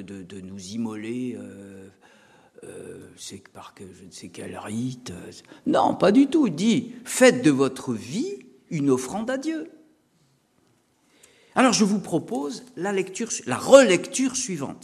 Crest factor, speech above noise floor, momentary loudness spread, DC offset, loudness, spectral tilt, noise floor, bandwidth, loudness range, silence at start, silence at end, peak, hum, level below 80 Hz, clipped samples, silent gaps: 24 dB; 41 dB; 23 LU; under 0.1%; -22 LUFS; -4.5 dB/octave; -65 dBFS; 13.5 kHz; 16 LU; 0 s; 0.1 s; 0 dBFS; none; -66 dBFS; under 0.1%; none